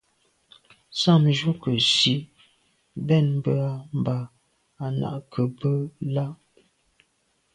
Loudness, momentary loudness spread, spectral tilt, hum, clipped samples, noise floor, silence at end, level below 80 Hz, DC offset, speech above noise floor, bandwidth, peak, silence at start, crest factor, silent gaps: -24 LUFS; 15 LU; -5.5 dB/octave; none; under 0.1%; -69 dBFS; 1.2 s; -62 dBFS; under 0.1%; 46 dB; 11 kHz; -6 dBFS; 0.9 s; 20 dB; none